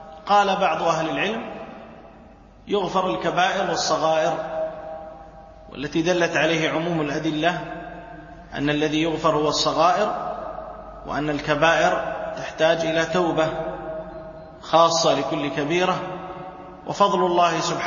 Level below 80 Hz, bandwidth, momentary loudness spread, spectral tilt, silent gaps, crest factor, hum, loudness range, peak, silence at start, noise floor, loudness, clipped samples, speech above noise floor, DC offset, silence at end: -50 dBFS; 7.4 kHz; 19 LU; -4 dB/octave; none; 20 dB; none; 2 LU; -4 dBFS; 0 s; -47 dBFS; -22 LUFS; under 0.1%; 26 dB; under 0.1%; 0 s